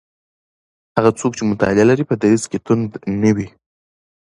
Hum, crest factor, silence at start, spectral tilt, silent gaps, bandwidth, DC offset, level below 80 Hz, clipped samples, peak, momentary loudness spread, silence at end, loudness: none; 18 dB; 0.95 s; -6.5 dB/octave; none; 11.5 kHz; under 0.1%; -48 dBFS; under 0.1%; 0 dBFS; 8 LU; 0.75 s; -17 LUFS